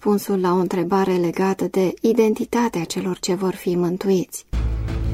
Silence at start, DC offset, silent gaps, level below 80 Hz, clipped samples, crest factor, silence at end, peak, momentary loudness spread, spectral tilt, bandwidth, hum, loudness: 0 s; under 0.1%; none; -32 dBFS; under 0.1%; 16 dB; 0 s; -4 dBFS; 6 LU; -6 dB/octave; 16 kHz; none; -21 LUFS